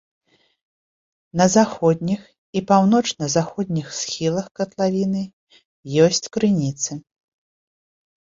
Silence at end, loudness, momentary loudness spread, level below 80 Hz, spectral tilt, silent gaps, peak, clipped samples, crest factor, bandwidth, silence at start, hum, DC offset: 1.35 s; -20 LUFS; 12 LU; -58 dBFS; -5 dB/octave; 2.38-2.53 s, 4.51-4.55 s, 5.33-5.47 s, 5.65-5.83 s; -2 dBFS; under 0.1%; 20 dB; 7.8 kHz; 1.35 s; none; under 0.1%